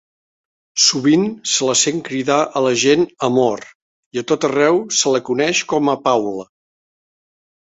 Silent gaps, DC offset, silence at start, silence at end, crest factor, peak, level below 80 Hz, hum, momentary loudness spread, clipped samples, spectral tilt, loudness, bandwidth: 3.75-4.11 s; under 0.1%; 0.75 s; 1.3 s; 16 dB; -2 dBFS; -60 dBFS; none; 9 LU; under 0.1%; -3 dB/octave; -16 LUFS; 8.4 kHz